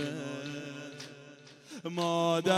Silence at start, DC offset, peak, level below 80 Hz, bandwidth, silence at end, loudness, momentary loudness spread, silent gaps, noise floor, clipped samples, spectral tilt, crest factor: 0 s; under 0.1%; -14 dBFS; -80 dBFS; 14.5 kHz; 0 s; -34 LUFS; 22 LU; none; -53 dBFS; under 0.1%; -5 dB/octave; 20 dB